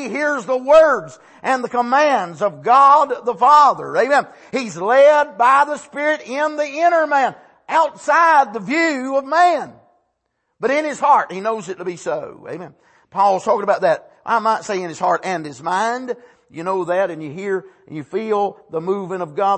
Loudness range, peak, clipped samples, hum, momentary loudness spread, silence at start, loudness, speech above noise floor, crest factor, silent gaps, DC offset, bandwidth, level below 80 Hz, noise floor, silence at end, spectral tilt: 8 LU; -2 dBFS; under 0.1%; none; 14 LU; 0 s; -17 LUFS; 55 dB; 16 dB; none; under 0.1%; 8.8 kHz; -64 dBFS; -72 dBFS; 0 s; -4.5 dB/octave